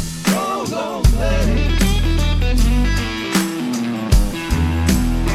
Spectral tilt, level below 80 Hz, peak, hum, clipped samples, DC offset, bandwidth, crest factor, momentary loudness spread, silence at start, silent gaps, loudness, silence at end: -5 dB/octave; -18 dBFS; -2 dBFS; none; under 0.1%; under 0.1%; 15 kHz; 14 dB; 4 LU; 0 s; none; -18 LUFS; 0 s